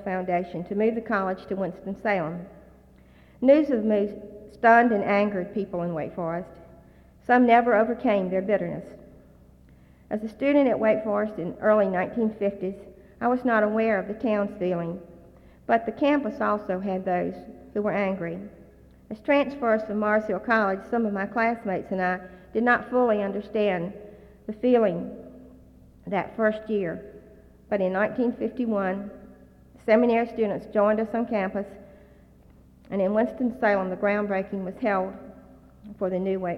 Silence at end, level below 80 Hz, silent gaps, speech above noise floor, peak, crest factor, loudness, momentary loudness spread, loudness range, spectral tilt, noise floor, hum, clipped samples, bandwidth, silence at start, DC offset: 0 s; -56 dBFS; none; 29 dB; -6 dBFS; 20 dB; -25 LUFS; 13 LU; 5 LU; -8.5 dB/octave; -53 dBFS; none; under 0.1%; 6.4 kHz; 0 s; under 0.1%